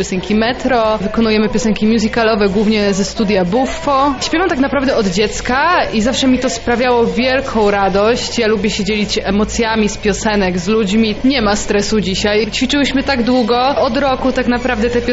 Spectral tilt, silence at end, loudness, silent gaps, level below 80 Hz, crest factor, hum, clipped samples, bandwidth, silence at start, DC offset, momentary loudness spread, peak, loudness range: -4.5 dB/octave; 0 s; -14 LUFS; none; -32 dBFS; 12 dB; none; under 0.1%; 8 kHz; 0 s; under 0.1%; 3 LU; -2 dBFS; 1 LU